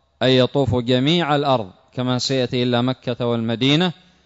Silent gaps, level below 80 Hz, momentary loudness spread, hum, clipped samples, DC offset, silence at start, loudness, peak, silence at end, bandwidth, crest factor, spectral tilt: none; -50 dBFS; 7 LU; none; under 0.1%; under 0.1%; 0.2 s; -19 LUFS; -4 dBFS; 0.35 s; 8 kHz; 14 dB; -6 dB/octave